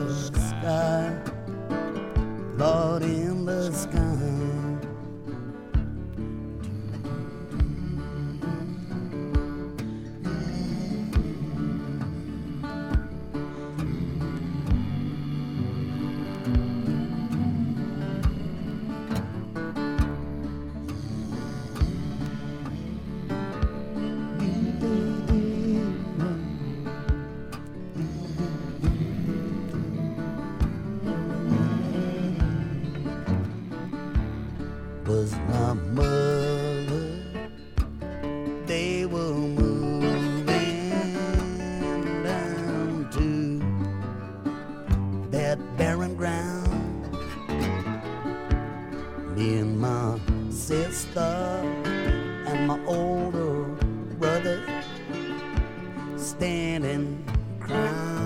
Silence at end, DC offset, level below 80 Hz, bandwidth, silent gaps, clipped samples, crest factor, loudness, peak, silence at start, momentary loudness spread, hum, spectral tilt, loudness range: 0 s; under 0.1%; -36 dBFS; 16 kHz; none; under 0.1%; 18 dB; -29 LUFS; -8 dBFS; 0 s; 9 LU; none; -6.5 dB/octave; 5 LU